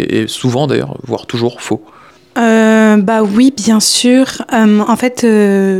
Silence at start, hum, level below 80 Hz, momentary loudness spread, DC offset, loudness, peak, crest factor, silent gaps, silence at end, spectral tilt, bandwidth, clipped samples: 0 s; none; -52 dBFS; 12 LU; 0.1%; -11 LUFS; 0 dBFS; 10 dB; none; 0 s; -4.5 dB/octave; 15.5 kHz; under 0.1%